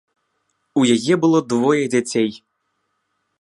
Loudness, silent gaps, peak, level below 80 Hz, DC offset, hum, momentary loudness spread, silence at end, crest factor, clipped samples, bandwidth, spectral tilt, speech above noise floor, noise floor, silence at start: -18 LUFS; none; -4 dBFS; -66 dBFS; under 0.1%; none; 6 LU; 1.05 s; 16 dB; under 0.1%; 11.5 kHz; -5 dB/octave; 55 dB; -72 dBFS; 0.75 s